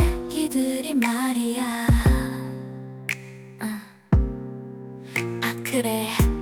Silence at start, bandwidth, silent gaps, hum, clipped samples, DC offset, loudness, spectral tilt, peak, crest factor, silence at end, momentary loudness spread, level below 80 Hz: 0 s; 19 kHz; none; none; under 0.1%; under 0.1%; -25 LUFS; -5.5 dB/octave; -8 dBFS; 16 dB; 0 s; 15 LU; -30 dBFS